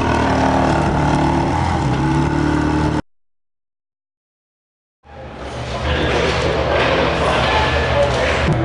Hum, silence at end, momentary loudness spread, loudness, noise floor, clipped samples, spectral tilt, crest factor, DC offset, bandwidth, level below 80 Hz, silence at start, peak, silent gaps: none; 0 s; 9 LU; -17 LUFS; under -90 dBFS; under 0.1%; -6 dB/octave; 16 dB; under 0.1%; 11 kHz; -28 dBFS; 0 s; -2 dBFS; 4.17-5.03 s